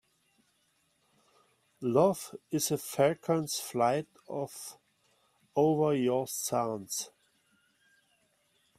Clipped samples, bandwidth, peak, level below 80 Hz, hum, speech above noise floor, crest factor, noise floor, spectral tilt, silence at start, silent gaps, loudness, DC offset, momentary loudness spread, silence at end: under 0.1%; 16 kHz; -12 dBFS; -74 dBFS; none; 43 dB; 20 dB; -73 dBFS; -5 dB/octave; 1.8 s; none; -31 LUFS; under 0.1%; 12 LU; 1.7 s